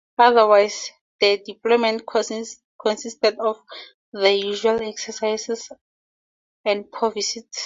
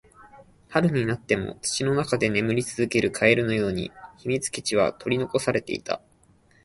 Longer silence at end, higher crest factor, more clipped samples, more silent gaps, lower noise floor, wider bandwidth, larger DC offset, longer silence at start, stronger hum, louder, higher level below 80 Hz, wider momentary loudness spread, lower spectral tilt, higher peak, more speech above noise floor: second, 0 s vs 0.65 s; about the same, 20 dB vs 22 dB; neither; first, 1.01-1.19 s, 2.64-2.79 s, 3.94-4.12 s, 5.81-6.64 s vs none; first, under -90 dBFS vs -59 dBFS; second, 7.8 kHz vs 11.5 kHz; neither; about the same, 0.2 s vs 0.25 s; neither; first, -21 LUFS vs -25 LUFS; second, -68 dBFS vs -54 dBFS; first, 17 LU vs 9 LU; second, -2 dB/octave vs -5 dB/octave; about the same, -2 dBFS vs -4 dBFS; first, over 69 dB vs 35 dB